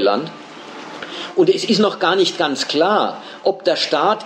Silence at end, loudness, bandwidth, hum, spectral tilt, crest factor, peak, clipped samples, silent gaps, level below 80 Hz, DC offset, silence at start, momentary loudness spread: 0 s; -17 LUFS; 10 kHz; none; -4 dB/octave; 16 dB; -2 dBFS; under 0.1%; none; -70 dBFS; under 0.1%; 0 s; 16 LU